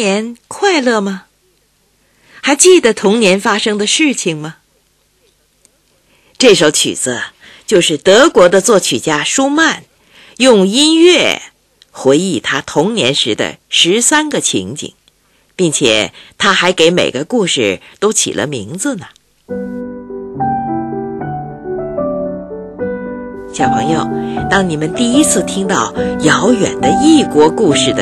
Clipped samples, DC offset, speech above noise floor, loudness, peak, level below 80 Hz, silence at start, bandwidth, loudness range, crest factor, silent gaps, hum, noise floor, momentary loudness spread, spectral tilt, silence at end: 0.3%; under 0.1%; 45 dB; -12 LUFS; 0 dBFS; -46 dBFS; 0 s; 13.5 kHz; 9 LU; 12 dB; none; none; -56 dBFS; 15 LU; -3 dB/octave; 0 s